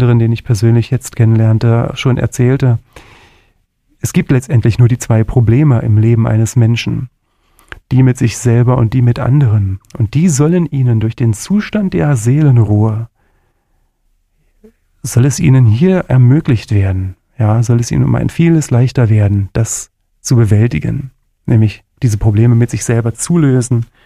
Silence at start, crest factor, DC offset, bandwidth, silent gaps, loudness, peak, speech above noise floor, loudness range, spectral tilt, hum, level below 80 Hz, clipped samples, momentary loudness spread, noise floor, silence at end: 0 s; 12 dB; under 0.1%; 13 kHz; none; -12 LUFS; 0 dBFS; 48 dB; 3 LU; -7 dB/octave; none; -34 dBFS; under 0.1%; 8 LU; -59 dBFS; 0.2 s